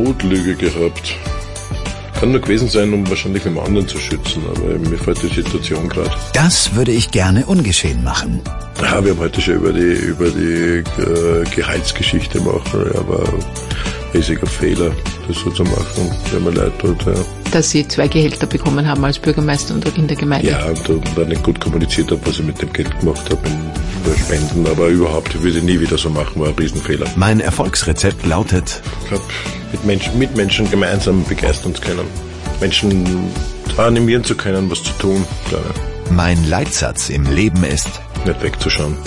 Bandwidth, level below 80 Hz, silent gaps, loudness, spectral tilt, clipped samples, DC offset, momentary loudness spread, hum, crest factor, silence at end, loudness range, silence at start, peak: 11.5 kHz; -26 dBFS; none; -16 LUFS; -5 dB/octave; under 0.1%; under 0.1%; 8 LU; none; 14 dB; 0 s; 3 LU; 0 s; -2 dBFS